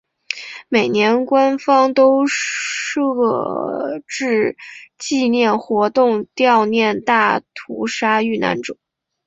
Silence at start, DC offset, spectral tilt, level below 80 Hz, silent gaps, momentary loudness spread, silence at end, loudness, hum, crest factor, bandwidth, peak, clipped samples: 0.3 s; under 0.1%; -4 dB/octave; -62 dBFS; none; 13 LU; 0.55 s; -17 LUFS; none; 16 dB; 8 kHz; 0 dBFS; under 0.1%